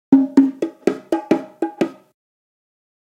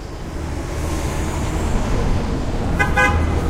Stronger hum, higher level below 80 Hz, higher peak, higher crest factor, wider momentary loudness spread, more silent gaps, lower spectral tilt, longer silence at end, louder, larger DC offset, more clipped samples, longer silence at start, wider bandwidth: neither; second, -66 dBFS vs -24 dBFS; first, 0 dBFS vs -4 dBFS; about the same, 20 dB vs 16 dB; about the same, 11 LU vs 11 LU; neither; first, -7 dB/octave vs -5.5 dB/octave; first, 1.15 s vs 0 s; about the same, -19 LUFS vs -21 LUFS; neither; neither; about the same, 0.1 s vs 0 s; second, 9.4 kHz vs 15.5 kHz